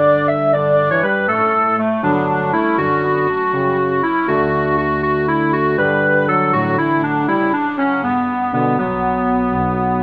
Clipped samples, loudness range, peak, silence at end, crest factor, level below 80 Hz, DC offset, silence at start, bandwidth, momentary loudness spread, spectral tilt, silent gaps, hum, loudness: under 0.1%; 1 LU; -2 dBFS; 0 s; 14 dB; -42 dBFS; 0.2%; 0 s; 5.4 kHz; 3 LU; -9.5 dB/octave; none; none; -16 LUFS